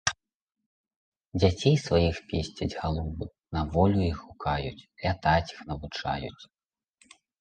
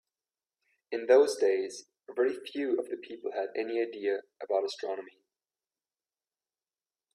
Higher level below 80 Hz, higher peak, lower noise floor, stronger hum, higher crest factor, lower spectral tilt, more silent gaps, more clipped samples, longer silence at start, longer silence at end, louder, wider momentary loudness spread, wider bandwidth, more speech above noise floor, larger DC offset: first, -40 dBFS vs -82 dBFS; first, -8 dBFS vs -12 dBFS; second, -67 dBFS vs under -90 dBFS; neither; about the same, 20 dB vs 22 dB; first, -5.5 dB/octave vs -3 dB/octave; first, 0.34-0.47 s, 0.66-0.84 s, 0.96-1.12 s, 1.26-1.32 s vs none; neither; second, 0.05 s vs 0.9 s; second, 0.95 s vs 2.05 s; first, -28 LUFS vs -31 LUFS; second, 13 LU vs 16 LU; second, 9.2 kHz vs 13 kHz; second, 40 dB vs over 60 dB; neither